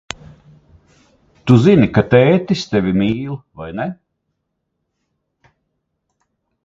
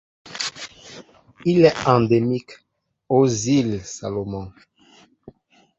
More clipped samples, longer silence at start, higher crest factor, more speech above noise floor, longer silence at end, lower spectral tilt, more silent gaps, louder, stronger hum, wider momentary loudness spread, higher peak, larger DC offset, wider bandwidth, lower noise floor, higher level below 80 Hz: neither; first, 1.45 s vs 0.25 s; about the same, 18 dB vs 20 dB; first, 59 dB vs 35 dB; first, 2.75 s vs 0.5 s; first, -7.5 dB/octave vs -5.5 dB/octave; neither; first, -15 LUFS vs -20 LUFS; neither; second, 18 LU vs 21 LU; about the same, 0 dBFS vs -2 dBFS; neither; about the same, 7.8 kHz vs 8.2 kHz; first, -73 dBFS vs -54 dBFS; first, -46 dBFS vs -52 dBFS